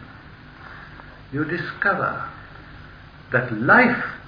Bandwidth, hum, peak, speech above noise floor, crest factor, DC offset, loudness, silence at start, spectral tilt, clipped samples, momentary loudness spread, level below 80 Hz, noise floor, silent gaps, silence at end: 5.2 kHz; none; -4 dBFS; 23 dB; 20 dB; under 0.1%; -20 LUFS; 0 s; -8.5 dB/octave; under 0.1%; 27 LU; -50 dBFS; -43 dBFS; none; 0 s